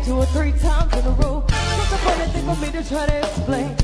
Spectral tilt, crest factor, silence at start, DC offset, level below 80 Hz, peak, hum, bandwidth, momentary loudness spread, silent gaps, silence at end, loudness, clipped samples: -5.5 dB/octave; 16 dB; 0 s; under 0.1%; -20 dBFS; -2 dBFS; none; 11 kHz; 3 LU; none; 0 s; -21 LUFS; under 0.1%